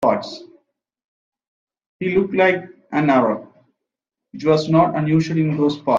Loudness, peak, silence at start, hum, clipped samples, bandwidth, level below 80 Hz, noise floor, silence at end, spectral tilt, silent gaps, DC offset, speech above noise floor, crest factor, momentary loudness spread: -19 LUFS; -2 dBFS; 0 s; none; under 0.1%; 7.6 kHz; -54 dBFS; -84 dBFS; 0 s; -7.5 dB/octave; 1.04-1.32 s, 1.48-1.67 s, 1.86-2.00 s; under 0.1%; 67 dB; 18 dB; 10 LU